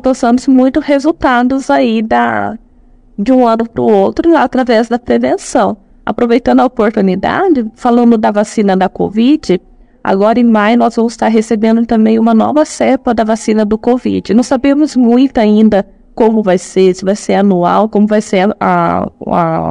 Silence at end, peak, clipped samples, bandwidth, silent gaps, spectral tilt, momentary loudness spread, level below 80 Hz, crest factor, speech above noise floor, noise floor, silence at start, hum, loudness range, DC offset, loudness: 0 s; 0 dBFS; 1%; 10.5 kHz; none; -6.5 dB/octave; 5 LU; -40 dBFS; 10 dB; 33 dB; -42 dBFS; 0.05 s; none; 1 LU; 0.2%; -11 LUFS